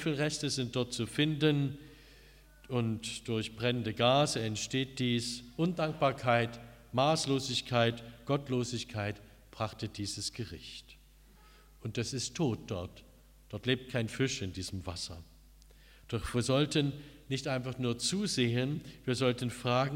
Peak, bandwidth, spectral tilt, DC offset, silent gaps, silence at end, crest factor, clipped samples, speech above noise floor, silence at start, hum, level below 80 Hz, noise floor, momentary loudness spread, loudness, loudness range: -12 dBFS; 16 kHz; -5 dB/octave; under 0.1%; none; 0 s; 20 dB; under 0.1%; 26 dB; 0 s; none; -58 dBFS; -59 dBFS; 12 LU; -33 LUFS; 7 LU